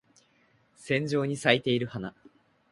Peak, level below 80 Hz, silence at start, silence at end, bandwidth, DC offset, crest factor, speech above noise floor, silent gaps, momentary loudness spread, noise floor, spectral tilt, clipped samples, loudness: -6 dBFS; -66 dBFS; 0.8 s; 0.6 s; 11.5 kHz; under 0.1%; 26 dB; 39 dB; none; 16 LU; -66 dBFS; -5.5 dB/octave; under 0.1%; -28 LUFS